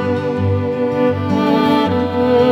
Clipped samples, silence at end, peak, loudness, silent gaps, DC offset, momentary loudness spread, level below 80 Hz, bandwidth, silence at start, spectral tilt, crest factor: under 0.1%; 0 s; -2 dBFS; -16 LUFS; none; under 0.1%; 4 LU; -50 dBFS; 14.5 kHz; 0 s; -8 dB/octave; 12 dB